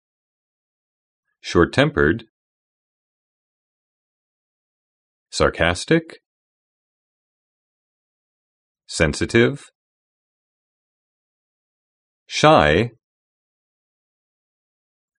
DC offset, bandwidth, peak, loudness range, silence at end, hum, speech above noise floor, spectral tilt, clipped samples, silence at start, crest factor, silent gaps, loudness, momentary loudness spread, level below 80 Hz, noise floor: under 0.1%; 10.5 kHz; 0 dBFS; 7 LU; 2.3 s; none; over 72 dB; -5 dB/octave; under 0.1%; 1.45 s; 24 dB; 2.29-5.26 s, 6.26-8.75 s, 9.75-12.26 s; -18 LUFS; 14 LU; -44 dBFS; under -90 dBFS